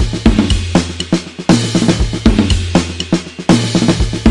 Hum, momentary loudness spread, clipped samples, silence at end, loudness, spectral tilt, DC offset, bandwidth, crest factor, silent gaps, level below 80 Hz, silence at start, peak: none; 5 LU; under 0.1%; 0 s; -14 LUFS; -5.5 dB/octave; under 0.1%; 11.5 kHz; 12 dB; none; -22 dBFS; 0 s; 0 dBFS